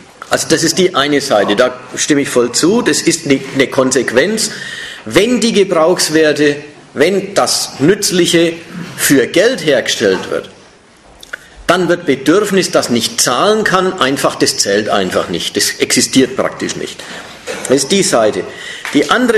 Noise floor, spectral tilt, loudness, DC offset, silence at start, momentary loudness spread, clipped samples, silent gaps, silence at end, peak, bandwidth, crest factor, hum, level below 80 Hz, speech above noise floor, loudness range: -42 dBFS; -3 dB/octave; -12 LUFS; under 0.1%; 0.2 s; 12 LU; 0.1%; none; 0 s; 0 dBFS; 13 kHz; 12 dB; none; -48 dBFS; 30 dB; 3 LU